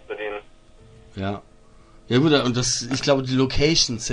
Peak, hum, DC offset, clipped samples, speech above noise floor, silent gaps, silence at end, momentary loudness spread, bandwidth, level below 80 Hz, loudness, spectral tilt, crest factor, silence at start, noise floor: -4 dBFS; none; under 0.1%; under 0.1%; 28 dB; none; 0 s; 14 LU; 10.5 kHz; -40 dBFS; -21 LUFS; -4 dB/octave; 18 dB; 0.1 s; -49 dBFS